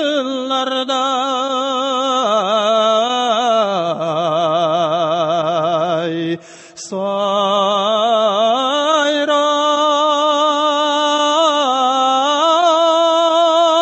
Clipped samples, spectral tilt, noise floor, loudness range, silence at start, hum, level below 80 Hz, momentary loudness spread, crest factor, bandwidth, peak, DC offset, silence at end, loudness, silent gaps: under 0.1%; -3.5 dB/octave; -35 dBFS; 4 LU; 0 s; none; -70 dBFS; 6 LU; 12 dB; 8.4 kHz; -2 dBFS; under 0.1%; 0 s; -15 LUFS; none